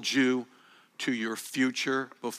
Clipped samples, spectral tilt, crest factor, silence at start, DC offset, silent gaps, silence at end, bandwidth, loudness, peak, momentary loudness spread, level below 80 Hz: under 0.1%; -3 dB/octave; 18 dB; 0 s; under 0.1%; none; 0 s; 15.5 kHz; -30 LUFS; -14 dBFS; 12 LU; -88 dBFS